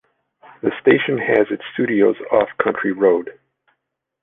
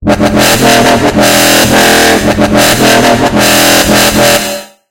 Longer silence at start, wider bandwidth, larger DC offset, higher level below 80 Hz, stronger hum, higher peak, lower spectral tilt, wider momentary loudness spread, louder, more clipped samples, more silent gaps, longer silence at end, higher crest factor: first, 0.65 s vs 0 s; second, 3.9 kHz vs over 20 kHz; second, under 0.1% vs 0.6%; second, -60 dBFS vs -28 dBFS; neither; about the same, 0 dBFS vs 0 dBFS; first, -9 dB/octave vs -3 dB/octave; first, 7 LU vs 4 LU; second, -18 LUFS vs -5 LUFS; second, under 0.1% vs 3%; neither; first, 0.9 s vs 0.25 s; first, 18 dB vs 6 dB